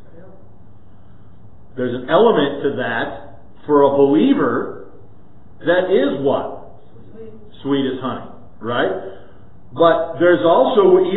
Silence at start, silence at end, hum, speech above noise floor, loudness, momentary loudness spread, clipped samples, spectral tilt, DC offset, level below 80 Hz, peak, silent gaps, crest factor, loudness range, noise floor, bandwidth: 1.75 s; 0 s; none; 31 dB; -16 LUFS; 19 LU; under 0.1%; -11 dB/octave; 2%; -52 dBFS; 0 dBFS; none; 18 dB; 6 LU; -46 dBFS; 4.1 kHz